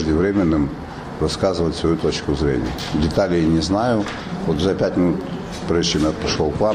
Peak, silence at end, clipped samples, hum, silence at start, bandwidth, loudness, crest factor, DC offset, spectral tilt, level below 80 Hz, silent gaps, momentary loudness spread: -4 dBFS; 0 s; under 0.1%; none; 0 s; 15 kHz; -20 LUFS; 16 dB; 0.1%; -6 dB/octave; -34 dBFS; none; 8 LU